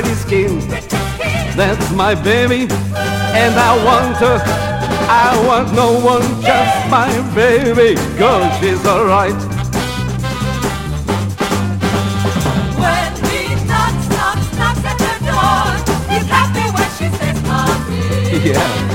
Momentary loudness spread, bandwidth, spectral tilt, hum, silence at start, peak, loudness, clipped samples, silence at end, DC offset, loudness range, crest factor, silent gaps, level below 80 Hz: 7 LU; 16.5 kHz; -5 dB/octave; none; 0 s; 0 dBFS; -14 LUFS; under 0.1%; 0 s; under 0.1%; 4 LU; 14 dB; none; -30 dBFS